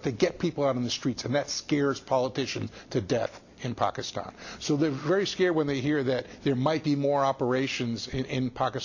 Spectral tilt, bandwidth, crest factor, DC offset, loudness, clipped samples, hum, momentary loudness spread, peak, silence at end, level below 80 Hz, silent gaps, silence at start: -5.5 dB/octave; 7.4 kHz; 16 dB; under 0.1%; -28 LUFS; under 0.1%; none; 8 LU; -12 dBFS; 0 s; -56 dBFS; none; 0 s